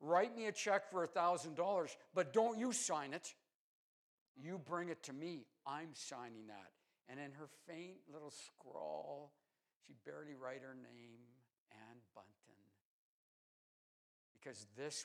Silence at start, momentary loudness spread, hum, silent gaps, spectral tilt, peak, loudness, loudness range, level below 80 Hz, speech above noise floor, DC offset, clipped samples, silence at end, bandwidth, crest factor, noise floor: 0 s; 21 LU; none; 3.55-4.35 s, 9.76-9.80 s, 11.60-11.66 s, 12.81-14.35 s; -3.5 dB/octave; -24 dBFS; -43 LUFS; 18 LU; under -90 dBFS; 30 dB; under 0.1%; under 0.1%; 0 s; 14 kHz; 22 dB; -74 dBFS